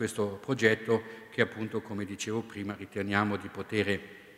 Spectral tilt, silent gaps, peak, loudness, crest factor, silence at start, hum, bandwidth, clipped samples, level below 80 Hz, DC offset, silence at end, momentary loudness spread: -5 dB/octave; none; -8 dBFS; -32 LUFS; 22 dB; 0 s; none; 15.5 kHz; under 0.1%; -70 dBFS; under 0.1%; 0 s; 11 LU